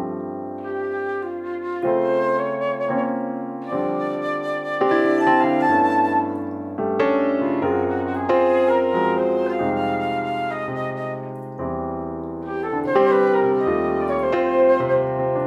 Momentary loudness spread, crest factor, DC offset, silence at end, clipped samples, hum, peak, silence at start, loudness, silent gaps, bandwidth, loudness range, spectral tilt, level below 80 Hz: 12 LU; 16 dB; under 0.1%; 0 s; under 0.1%; none; -6 dBFS; 0 s; -21 LUFS; none; 8.4 kHz; 4 LU; -8 dB/octave; -54 dBFS